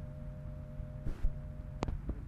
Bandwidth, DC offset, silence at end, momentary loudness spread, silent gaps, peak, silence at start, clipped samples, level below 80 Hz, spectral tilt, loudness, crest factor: 7.8 kHz; under 0.1%; 0 s; 6 LU; none; -14 dBFS; 0 s; under 0.1%; -40 dBFS; -8 dB/octave; -43 LUFS; 24 dB